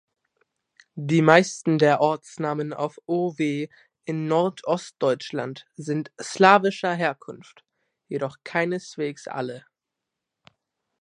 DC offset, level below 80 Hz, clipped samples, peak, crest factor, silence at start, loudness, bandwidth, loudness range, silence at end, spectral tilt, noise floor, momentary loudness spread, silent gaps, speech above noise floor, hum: under 0.1%; -74 dBFS; under 0.1%; 0 dBFS; 24 dB; 0.95 s; -23 LUFS; 10.5 kHz; 9 LU; 1.4 s; -5.5 dB/octave; -85 dBFS; 18 LU; none; 62 dB; none